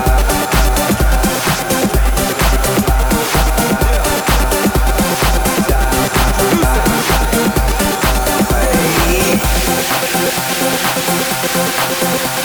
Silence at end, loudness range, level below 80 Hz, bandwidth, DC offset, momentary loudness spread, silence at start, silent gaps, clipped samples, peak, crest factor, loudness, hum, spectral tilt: 0 s; 1 LU; -18 dBFS; over 20 kHz; under 0.1%; 2 LU; 0 s; none; under 0.1%; 0 dBFS; 12 dB; -13 LUFS; none; -4 dB/octave